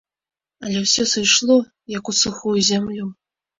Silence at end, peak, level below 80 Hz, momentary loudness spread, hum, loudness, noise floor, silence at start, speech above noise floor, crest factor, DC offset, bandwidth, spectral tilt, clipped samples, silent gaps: 0.45 s; -2 dBFS; -56 dBFS; 15 LU; none; -17 LUFS; under -90 dBFS; 0.6 s; over 71 dB; 18 dB; under 0.1%; 7.8 kHz; -2.5 dB/octave; under 0.1%; none